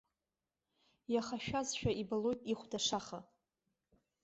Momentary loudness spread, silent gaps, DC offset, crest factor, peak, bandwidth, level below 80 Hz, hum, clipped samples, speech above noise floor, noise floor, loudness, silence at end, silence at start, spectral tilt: 10 LU; none; under 0.1%; 18 dB; -22 dBFS; 8 kHz; -64 dBFS; none; under 0.1%; over 52 dB; under -90 dBFS; -38 LUFS; 1 s; 1.1 s; -4 dB/octave